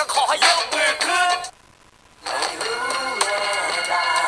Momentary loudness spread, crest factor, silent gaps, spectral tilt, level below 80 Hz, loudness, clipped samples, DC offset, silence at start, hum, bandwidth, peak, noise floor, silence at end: 9 LU; 18 dB; none; 1 dB/octave; -62 dBFS; -20 LUFS; under 0.1%; under 0.1%; 0 s; none; 11 kHz; -2 dBFS; -52 dBFS; 0 s